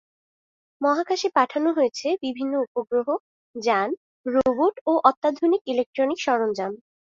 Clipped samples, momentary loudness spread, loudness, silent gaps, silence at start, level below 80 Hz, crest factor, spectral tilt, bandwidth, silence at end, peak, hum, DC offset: under 0.1%; 9 LU; -23 LUFS; 2.67-2.75 s, 3.20-3.54 s, 3.97-4.24 s, 4.81-4.86 s, 5.17-5.22 s, 5.61-5.65 s, 5.86-5.93 s; 0.8 s; -66 dBFS; 22 dB; -4 dB/octave; 7.8 kHz; 0.35 s; -2 dBFS; none; under 0.1%